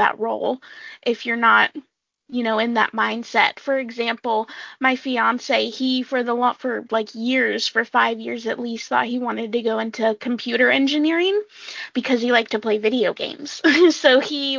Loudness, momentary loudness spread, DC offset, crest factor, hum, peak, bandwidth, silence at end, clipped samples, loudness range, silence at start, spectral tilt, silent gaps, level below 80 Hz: -20 LUFS; 10 LU; under 0.1%; 20 dB; none; -2 dBFS; 7.6 kHz; 0 s; under 0.1%; 2 LU; 0 s; -3.5 dB/octave; none; -72 dBFS